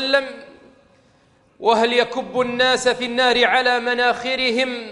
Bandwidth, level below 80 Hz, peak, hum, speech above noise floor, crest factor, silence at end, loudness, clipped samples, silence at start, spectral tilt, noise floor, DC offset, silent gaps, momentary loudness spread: 11.5 kHz; -56 dBFS; -2 dBFS; none; 38 dB; 18 dB; 0 s; -18 LUFS; under 0.1%; 0 s; -2.5 dB/octave; -57 dBFS; under 0.1%; none; 7 LU